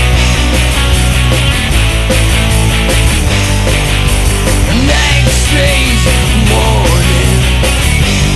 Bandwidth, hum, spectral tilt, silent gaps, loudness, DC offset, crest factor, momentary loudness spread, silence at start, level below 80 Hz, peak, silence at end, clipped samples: 12.5 kHz; none; -4 dB/octave; none; -10 LUFS; under 0.1%; 8 dB; 2 LU; 0 s; -12 dBFS; 0 dBFS; 0 s; under 0.1%